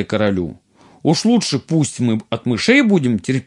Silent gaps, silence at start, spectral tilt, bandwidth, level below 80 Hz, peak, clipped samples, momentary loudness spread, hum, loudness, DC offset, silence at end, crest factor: none; 0 s; -5.5 dB/octave; 11.5 kHz; -56 dBFS; 0 dBFS; under 0.1%; 9 LU; none; -17 LUFS; under 0.1%; 0.05 s; 16 dB